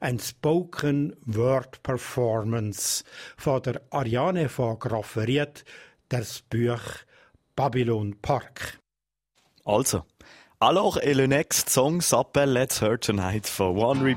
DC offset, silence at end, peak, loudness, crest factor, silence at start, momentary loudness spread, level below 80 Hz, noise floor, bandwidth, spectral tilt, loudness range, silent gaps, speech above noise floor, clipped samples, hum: under 0.1%; 0 s; -6 dBFS; -25 LUFS; 20 dB; 0 s; 10 LU; -54 dBFS; -89 dBFS; 16.5 kHz; -4.5 dB/octave; 7 LU; none; 64 dB; under 0.1%; none